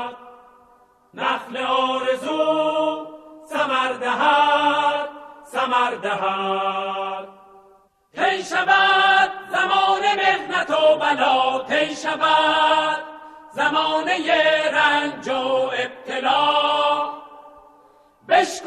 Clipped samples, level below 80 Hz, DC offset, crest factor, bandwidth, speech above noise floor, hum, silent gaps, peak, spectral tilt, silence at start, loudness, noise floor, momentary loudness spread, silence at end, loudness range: under 0.1%; -62 dBFS; under 0.1%; 18 dB; 13 kHz; 36 dB; none; none; -4 dBFS; -2.5 dB/octave; 0 s; -19 LUFS; -55 dBFS; 10 LU; 0 s; 6 LU